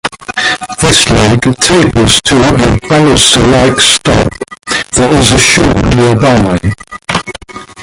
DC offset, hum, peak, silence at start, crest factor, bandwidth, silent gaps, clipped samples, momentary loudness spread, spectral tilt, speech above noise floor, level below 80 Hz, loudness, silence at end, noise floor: under 0.1%; none; 0 dBFS; 0.05 s; 8 dB; 16 kHz; none; 0.4%; 11 LU; -4 dB/octave; 20 dB; -24 dBFS; -7 LUFS; 0 s; -27 dBFS